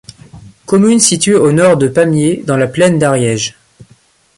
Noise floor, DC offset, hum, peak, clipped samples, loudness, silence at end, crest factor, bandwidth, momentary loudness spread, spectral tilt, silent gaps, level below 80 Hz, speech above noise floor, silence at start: -49 dBFS; under 0.1%; none; 0 dBFS; under 0.1%; -11 LUFS; 0.55 s; 12 dB; 16 kHz; 6 LU; -4.5 dB/octave; none; -48 dBFS; 39 dB; 0.35 s